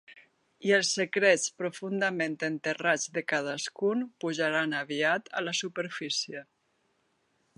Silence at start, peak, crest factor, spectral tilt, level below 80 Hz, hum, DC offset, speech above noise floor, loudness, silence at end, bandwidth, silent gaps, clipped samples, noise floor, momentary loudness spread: 0.1 s; -10 dBFS; 22 dB; -3 dB/octave; -84 dBFS; none; under 0.1%; 44 dB; -29 LUFS; 1.15 s; 11.5 kHz; none; under 0.1%; -73 dBFS; 9 LU